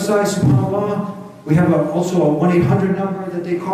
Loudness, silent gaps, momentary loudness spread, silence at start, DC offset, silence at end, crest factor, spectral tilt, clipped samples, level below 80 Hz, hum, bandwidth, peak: -17 LUFS; none; 9 LU; 0 s; under 0.1%; 0 s; 14 dB; -7.5 dB/octave; under 0.1%; -52 dBFS; none; 14.5 kHz; -2 dBFS